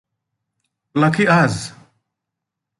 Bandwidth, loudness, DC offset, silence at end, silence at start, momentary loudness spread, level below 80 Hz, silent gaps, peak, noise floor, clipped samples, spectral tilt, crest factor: 11.5 kHz; -16 LUFS; under 0.1%; 1.1 s; 0.95 s; 14 LU; -54 dBFS; none; -2 dBFS; -82 dBFS; under 0.1%; -6 dB/octave; 18 dB